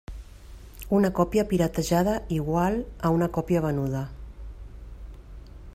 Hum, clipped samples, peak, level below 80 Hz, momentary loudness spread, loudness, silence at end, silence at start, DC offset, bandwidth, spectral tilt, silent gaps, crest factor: none; under 0.1%; -8 dBFS; -42 dBFS; 22 LU; -25 LUFS; 0 s; 0.1 s; under 0.1%; 16 kHz; -7 dB/octave; none; 18 dB